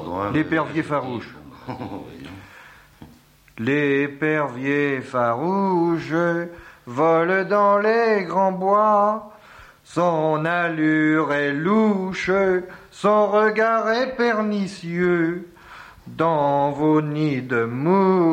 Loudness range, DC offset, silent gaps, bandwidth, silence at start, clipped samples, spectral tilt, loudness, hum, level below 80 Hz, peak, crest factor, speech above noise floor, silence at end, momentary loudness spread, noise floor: 6 LU; under 0.1%; none; 10 kHz; 0 s; under 0.1%; -7 dB/octave; -20 LUFS; none; -58 dBFS; -6 dBFS; 16 dB; 31 dB; 0 s; 15 LU; -51 dBFS